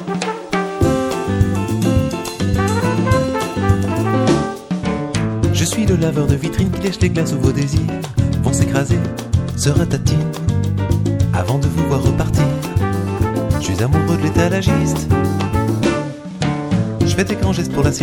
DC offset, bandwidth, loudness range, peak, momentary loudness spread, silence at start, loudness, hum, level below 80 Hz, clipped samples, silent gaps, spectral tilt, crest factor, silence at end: under 0.1%; 17 kHz; 1 LU; 0 dBFS; 4 LU; 0 s; -17 LUFS; none; -30 dBFS; under 0.1%; none; -6 dB/octave; 16 dB; 0 s